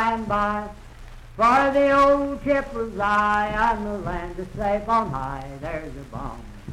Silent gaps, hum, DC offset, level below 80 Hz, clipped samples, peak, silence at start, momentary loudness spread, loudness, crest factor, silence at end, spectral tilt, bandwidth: none; none; under 0.1%; -40 dBFS; under 0.1%; -6 dBFS; 0 s; 17 LU; -22 LUFS; 16 dB; 0 s; -6 dB/octave; 12.5 kHz